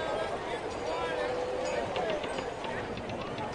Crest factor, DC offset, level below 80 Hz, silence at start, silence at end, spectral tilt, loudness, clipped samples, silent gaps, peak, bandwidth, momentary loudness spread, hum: 16 dB; under 0.1%; -54 dBFS; 0 s; 0 s; -4.5 dB/octave; -34 LUFS; under 0.1%; none; -18 dBFS; 11.5 kHz; 4 LU; none